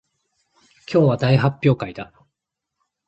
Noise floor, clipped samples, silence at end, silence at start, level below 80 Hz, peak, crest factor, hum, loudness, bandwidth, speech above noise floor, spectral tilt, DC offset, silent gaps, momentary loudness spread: -82 dBFS; under 0.1%; 1.05 s; 0.9 s; -54 dBFS; -4 dBFS; 18 dB; none; -19 LUFS; 7.8 kHz; 64 dB; -8.5 dB/octave; under 0.1%; none; 17 LU